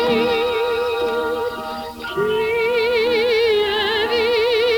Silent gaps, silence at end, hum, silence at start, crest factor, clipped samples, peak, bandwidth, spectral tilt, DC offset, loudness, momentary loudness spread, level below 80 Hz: none; 0 s; none; 0 s; 12 dB; under 0.1%; -8 dBFS; over 20 kHz; -4 dB/octave; under 0.1%; -19 LUFS; 8 LU; -48 dBFS